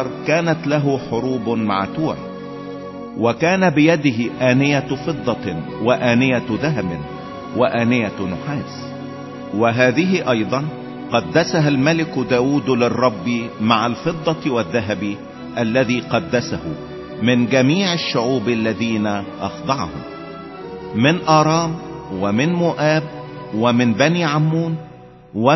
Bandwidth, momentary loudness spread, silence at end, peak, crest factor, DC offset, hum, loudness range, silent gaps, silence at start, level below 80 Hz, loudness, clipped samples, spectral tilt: 6.2 kHz; 15 LU; 0 s; 0 dBFS; 18 dB; under 0.1%; none; 3 LU; none; 0 s; -48 dBFS; -18 LUFS; under 0.1%; -6 dB/octave